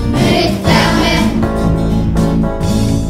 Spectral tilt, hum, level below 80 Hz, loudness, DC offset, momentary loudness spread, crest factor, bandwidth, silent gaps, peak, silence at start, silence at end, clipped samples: -6 dB/octave; none; -20 dBFS; -13 LUFS; under 0.1%; 4 LU; 12 dB; 16 kHz; none; 0 dBFS; 0 s; 0 s; under 0.1%